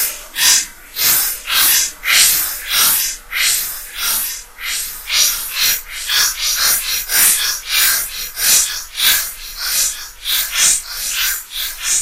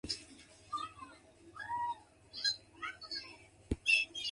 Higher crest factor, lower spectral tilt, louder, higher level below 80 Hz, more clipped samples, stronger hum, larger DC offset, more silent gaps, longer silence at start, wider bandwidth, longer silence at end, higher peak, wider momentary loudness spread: second, 16 dB vs 24 dB; second, 3 dB/octave vs -2 dB/octave; first, -14 LUFS vs -36 LUFS; first, -42 dBFS vs -58 dBFS; neither; neither; neither; neither; about the same, 0 s vs 0.05 s; first, 17.5 kHz vs 11.5 kHz; about the same, 0 s vs 0 s; first, 0 dBFS vs -18 dBFS; second, 10 LU vs 25 LU